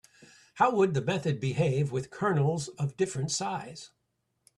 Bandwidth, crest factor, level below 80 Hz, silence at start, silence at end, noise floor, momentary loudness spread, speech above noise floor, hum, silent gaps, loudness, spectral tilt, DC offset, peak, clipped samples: 11.5 kHz; 20 dB; -64 dBFS; 0.2 s; 0.7 s; -78 dBFS; 9 LU; 50 dB; none; none; -29 LUFS; -5.5 dB/octave; under 0.1%; -10 dBFS; under 0.1%